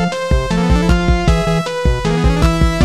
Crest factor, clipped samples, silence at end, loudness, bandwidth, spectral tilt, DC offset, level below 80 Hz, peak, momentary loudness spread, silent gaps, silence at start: 12 dB; under 0.1%; 0 s; -15 LUFS; 13.5 kHz; -6.5 dB/octave; under 0.1%; -18 dBFS; 0 dBFS; 3 LU; none; 0 s